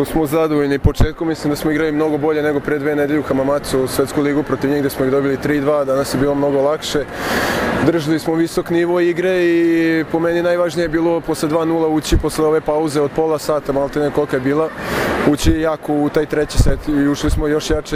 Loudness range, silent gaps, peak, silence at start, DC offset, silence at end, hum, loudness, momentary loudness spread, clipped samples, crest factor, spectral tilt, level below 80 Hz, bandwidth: 1 LU; none; 0 dBFS; 0 s; under 0.1%; 0 s; none; -17 LUFS; 3 LU; under 0.1%; 16 dB; -6 dB/octave; -28 dBFS; 16 kHz